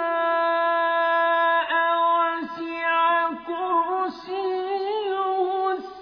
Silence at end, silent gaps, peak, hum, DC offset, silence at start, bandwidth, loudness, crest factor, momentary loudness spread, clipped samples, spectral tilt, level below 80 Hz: 0 s; none; -10 dBFS; none; under 0.1%; 0 s; 5.4 kHz; -23 LUFS; 12 dB; 7 LU; under 0.1%; -4.5 dB/octave; -70 dBFS